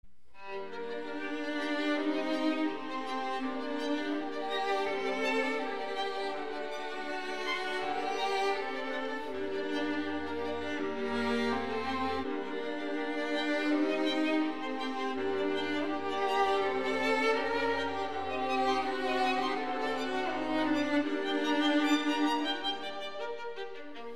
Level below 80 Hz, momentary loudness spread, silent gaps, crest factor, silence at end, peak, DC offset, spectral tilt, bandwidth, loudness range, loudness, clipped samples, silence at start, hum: -62 dBFS; 8 LU; none; 16 dB; 0 s; -16 dBFS; 0.7%; -4 dB/octave; 12.5 kHz; 4 LU; -32 LUFS; under 0.1%; 0.35 s; none